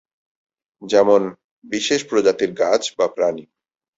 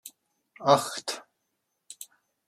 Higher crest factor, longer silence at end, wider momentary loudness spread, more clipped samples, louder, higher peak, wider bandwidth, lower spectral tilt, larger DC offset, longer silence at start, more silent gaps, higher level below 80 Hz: second, 18 dB vs 26 dB; about the same, 0.55 s vs 0.45 s; second, 10 LU vs 24 LU; neither; first, -19 LUFS vs -26 LUFS; about the same, -2 dBFS vs -4 dBFS; second, 8 kHz vs 15.5 kHz; about the same, -3.5 dB/octave vs -3.5 dB/octave; neither; first, 0.8 s vs 0.05 s; first, 1.44-1.62 s vs none; first, -62 dBFS vs -78 dBFS